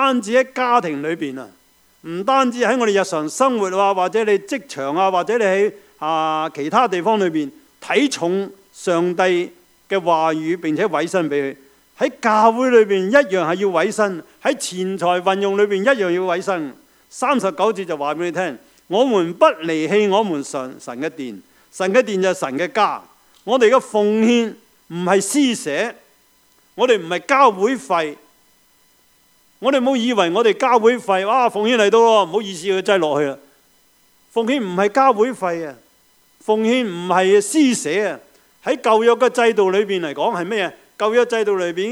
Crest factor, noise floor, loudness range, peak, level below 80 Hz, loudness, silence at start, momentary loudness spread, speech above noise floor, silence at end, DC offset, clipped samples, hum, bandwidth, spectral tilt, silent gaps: 18 dB; -56 dBFS; 3 LU; 0 dBFS; -72 dBFS; -18 LUFS; 0 s; 11 LU; 39 dB; 0 s; under 0.1%; under 0.1%; none; 16 kHz; -4 dB/octave; none